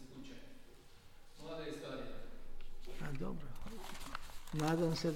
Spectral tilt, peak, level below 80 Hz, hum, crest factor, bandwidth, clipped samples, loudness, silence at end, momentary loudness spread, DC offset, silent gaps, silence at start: -6 dB/octave; -24 dBFS; -50 dBFS; none; 18 dB; 16 kHz; under 0.1%; -43 LUFS; 0 s; 26 LU; under 0.1%; none; 0 s